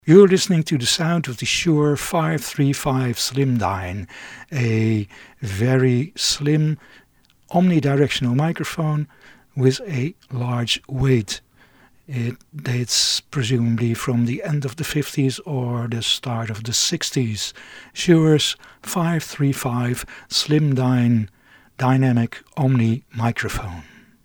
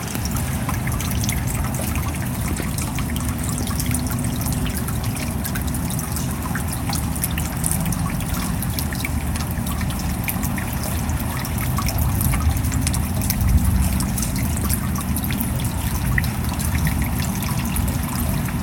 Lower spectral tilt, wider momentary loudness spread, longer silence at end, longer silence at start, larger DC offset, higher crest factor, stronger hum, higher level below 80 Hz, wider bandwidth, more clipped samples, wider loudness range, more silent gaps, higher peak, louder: about the same, -5 dB/octave vs -5 dB/octave; first, 12 LU vs 4 LU; first, 0.4 s vs 0 s; about the same, 0.05 s vs 0 s; neither; about the same, 20 dB vs 20 dB; neither; second, -48 dBFS vs -28 dBFS; first, 20 kHz vs 17.5 kHz; neither; about the same, 3 LU vs 3 LU; neither; about the same, 0 dBFS vs 0 dBFS; first, -20 LUFS vs -23 LUFS